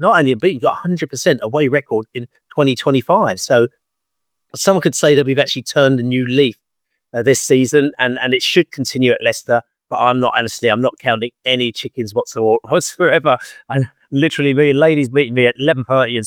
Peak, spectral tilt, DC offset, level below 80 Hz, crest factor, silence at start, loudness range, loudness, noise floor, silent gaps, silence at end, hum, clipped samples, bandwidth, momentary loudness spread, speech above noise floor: 0 dBFS; -4.5 dB/octave; under 0.1%; -62 dBFS; 16 dB; 0 s; 2 LU; -15 LUFS; -79 dBFS; none; 0 s; none; under 0.1%; 19 kHz; 8 LU; 64 dB